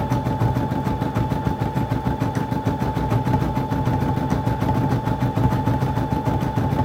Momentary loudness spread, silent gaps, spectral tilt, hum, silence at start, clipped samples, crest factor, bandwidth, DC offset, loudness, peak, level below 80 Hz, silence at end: 3 LU; none; -8 dB/octave; none; 0 s; under 0.1%; 16 dB; 16 kHz; under 0.1%; -22 LUFS; -6 dBFS; -34 dBFS; 0 s